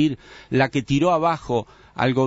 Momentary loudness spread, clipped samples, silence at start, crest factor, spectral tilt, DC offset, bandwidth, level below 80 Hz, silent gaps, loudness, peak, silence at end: 9 LU; under 0.1%; 0 s; 16 dB; -6.5 dB/octave; under 0.1%; 8 kHz; -48 dBFS; none; -22 LUFS; -4 dBFS; 0 s